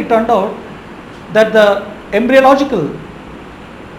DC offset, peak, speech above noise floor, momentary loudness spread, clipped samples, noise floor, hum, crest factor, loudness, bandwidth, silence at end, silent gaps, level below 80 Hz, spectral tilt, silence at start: under 0.1%; 0 dBFS; 21 dB; 23 LU; 0.1%; -32 dBFS; none; 14 dB; -12 LUFS; 16 kHz; 0 s; none; -44 dBFS; -5.5 dB/octave; 0 s